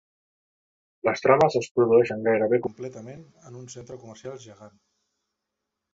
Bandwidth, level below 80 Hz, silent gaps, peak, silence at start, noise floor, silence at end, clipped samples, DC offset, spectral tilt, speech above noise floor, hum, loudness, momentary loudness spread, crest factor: 7.8 kHz; -64 dBFS; 1.71-1.75 s; -2 dBFS; 1.05 s; -83 dBFS; 1.25 s; under 0.1%; under 0.1%; -6 dB/octave; 59 dB; none; -22 LUFS; 23 LU; 24 dB